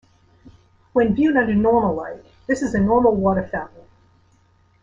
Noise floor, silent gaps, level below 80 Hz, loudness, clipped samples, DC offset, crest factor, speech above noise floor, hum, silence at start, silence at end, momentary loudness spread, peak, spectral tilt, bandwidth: -58 dBFS; none; -46 dBFS; -19 LUFS; under 0.1%; under 0.1%; 16 dB; 39 dB; none; 0.95 s; 1.15 s; 13 LU; -4 dBFS; -7.5 dB/octave; 7.8 kHz